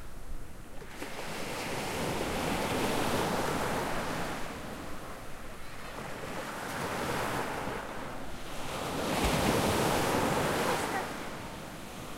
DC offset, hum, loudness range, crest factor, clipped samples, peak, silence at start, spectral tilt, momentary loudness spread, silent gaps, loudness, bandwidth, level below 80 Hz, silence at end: under 0.1%; none; 7 LU; 20 dB; under 0.1%; -14 dBFS; 0 s; -4 dB/octave; 16 LU; none; -33 LUFS; 16 kHz; -46 dBFS; 0 s